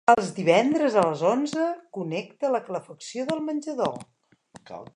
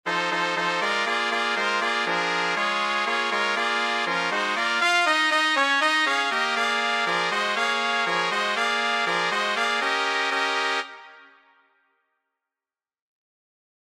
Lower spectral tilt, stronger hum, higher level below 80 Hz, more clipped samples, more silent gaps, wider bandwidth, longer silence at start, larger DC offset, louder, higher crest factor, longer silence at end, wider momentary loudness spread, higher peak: first, -5.5 dB/octave vs -1.5 dB/octave; neither; first, -70 dBFS vs -78 dBFS; neither; neither; second, 11 kHz vs 15.5 kHz; about the same, 0.1 s vs 0.05 s; neither; second, -25 LUFS vs -22 LUFS; about the same, 22 dB vs 18 dB; second, 0.1 s vs 2.6 s; first, 14 LU vs 4 LU; first, -2 dBFS vs -6 dBFS